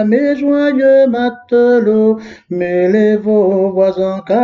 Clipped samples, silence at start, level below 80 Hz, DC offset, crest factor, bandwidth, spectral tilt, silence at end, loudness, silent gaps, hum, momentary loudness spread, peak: under 0.1%; 0 s; -56 dBFS; under 0.1%; 10 dB; 7 kHz; -8.5 dB/octave; 0 s; -12 LUFS; none; none; 8 LU; -2 dBFS